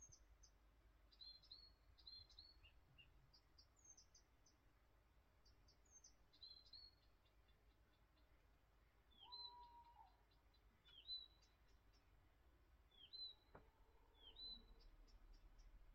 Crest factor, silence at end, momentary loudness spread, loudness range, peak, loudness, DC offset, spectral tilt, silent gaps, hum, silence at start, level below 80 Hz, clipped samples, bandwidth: 20 dB; 0 s; 14 LU; 8 LU; -46 dBFS; -61 LUFS; under 0.1%; -1 dB/octave; none; none; 0 s; -74 dBFS; under 0.1%; 6.6 kHz